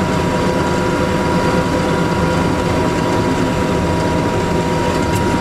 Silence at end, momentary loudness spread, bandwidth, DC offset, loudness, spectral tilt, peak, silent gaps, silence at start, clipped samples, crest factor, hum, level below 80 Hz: 0 s; 1 LU; 15 kHz; under 0.1%; -16 LUFS; -6 dB/octave; -4 dBFS; none; 0 s; under 0.1%; 12 dB; none; -30 dBFS